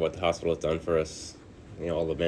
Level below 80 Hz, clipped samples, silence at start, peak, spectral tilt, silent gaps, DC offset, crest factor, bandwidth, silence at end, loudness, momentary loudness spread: -48 dBFS; under 0.1%; 0 s; -12 dBFS; -5.5 dB/octave; none; under 0.1%; 18 dB; 11 kHz; 0 s; -30 LUFS; 16 LU